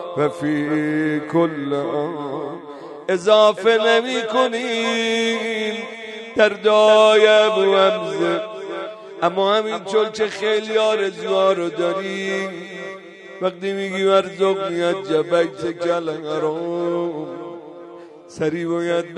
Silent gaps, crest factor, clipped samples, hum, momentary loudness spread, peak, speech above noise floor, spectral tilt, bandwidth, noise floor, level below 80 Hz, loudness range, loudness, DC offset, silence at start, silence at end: none; 18 dB; under 0.1%; none; 17 LU; 0 dBFS; 21 dB; -4.5 dB/octave; 11 kHz; -39 dBFS; -68 dBFS; 7 LU; -19 LUFS; under 0.1%; 0 s; 0 s